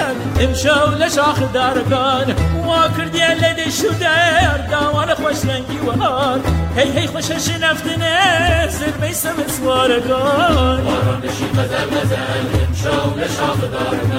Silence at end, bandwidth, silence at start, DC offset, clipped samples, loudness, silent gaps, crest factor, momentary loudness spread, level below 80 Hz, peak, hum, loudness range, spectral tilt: 0 s; 16 kHz; 0 s; under 0.1%; under 0.1%; -16 LUFS; none; 14 dB; 6 LU; -32 dBFS; -2 dBFS; none; 2 LU; -4.5 dB/octave